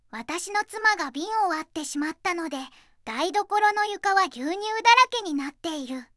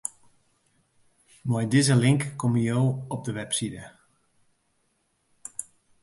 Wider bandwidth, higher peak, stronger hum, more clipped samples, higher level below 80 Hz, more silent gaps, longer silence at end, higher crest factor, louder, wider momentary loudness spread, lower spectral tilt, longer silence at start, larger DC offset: about the same, 12 kHz vs 11.5 kHz; first, -4 dBFS vs -8 dBFS; neither; neither; about the same, -66 dBFS vs -62 dBFS; neither; second, 0.15 s vs 0.4 s; about the same, 22 dB vs 20 dB; about the same, -24 LUFS vs -25 LUFS; about the same, 15 LU vs 17 LU; second, -1 dB/octave vs -5.5 dB/octave; about the same, 0.15 s vs 0.05 s; neither